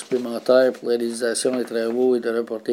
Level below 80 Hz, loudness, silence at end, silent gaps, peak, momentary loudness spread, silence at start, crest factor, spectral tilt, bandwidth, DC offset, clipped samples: -80 dBFS; -21 LUFS; 0 s; none; -4 dBFS; 7 LU; 0 s; 16 dB; -3.5 dB/octave; 16 kHz; under 0.1%; under 0.1%